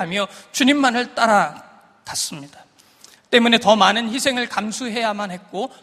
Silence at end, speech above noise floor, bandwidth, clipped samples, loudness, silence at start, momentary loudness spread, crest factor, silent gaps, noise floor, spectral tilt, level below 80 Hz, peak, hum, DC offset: 0.15 s; 31 dB; 15.5 kHz; under 0.1%; -18 LUFS; 0 s; 14 LU; 20 dB; none; -50 dBFS; -3 dB/octave; -62 dBFS; 0 dBFS; none; under 0.1%